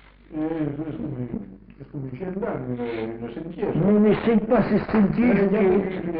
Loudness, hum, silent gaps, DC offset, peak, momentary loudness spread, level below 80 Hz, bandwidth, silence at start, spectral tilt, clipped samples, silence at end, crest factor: -23 LUFS; none; none; under 0.1%; -10 dBFS; 15 LU; -46 dBFS; 5 kHz; 0.3 s; -7.5 dB/octave; under 0.1%; 0 s; 12 dB